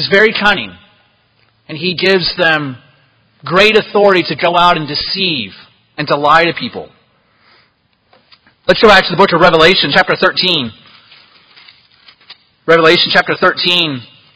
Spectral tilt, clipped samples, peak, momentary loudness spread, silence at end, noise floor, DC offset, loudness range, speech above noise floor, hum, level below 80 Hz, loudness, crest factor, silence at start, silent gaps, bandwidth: -5 dB/octave; 0.7%; 0 dBFS; 17 LU; 0.3 s; -57 dBFS; under 0.1%; 6 LU; 46 dB; none; -44 dBFS; -10 LUFS; 14 dB; 0 s; none; 8 kHz